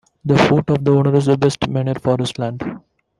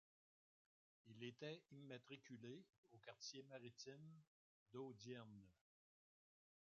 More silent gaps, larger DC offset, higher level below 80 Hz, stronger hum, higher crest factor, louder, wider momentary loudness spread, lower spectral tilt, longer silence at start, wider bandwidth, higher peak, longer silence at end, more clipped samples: second, none vs 2.78-2.83 s, 4.27-4.66 s; neither; first, -48 dBFS vs under -90 dBFS; neither; about the same, 16 dB vs 20 dB; first, -17 LUFS vs -59 LUFS; about the same, 10 LU vs 9 LU; first, -7 dB/octave vs -4.5 dB/octave; second, 0.25 s vs 1.05 s; first, 11.5 kHz vs 7.2 kHz; first, -2 dBFS vs -40 dBFS; second, 0.4 s vs 1.15 s; neither